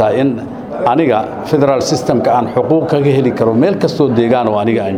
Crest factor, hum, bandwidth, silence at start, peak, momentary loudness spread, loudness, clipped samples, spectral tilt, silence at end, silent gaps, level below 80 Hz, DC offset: 12 dB; none; 15 kHz; 0 s; 0 dBFS; 5 LU; -13 LUFS; under 0.1%; -6.5 dB/octave; 0 s; none; -48 dBFS; under 0.1%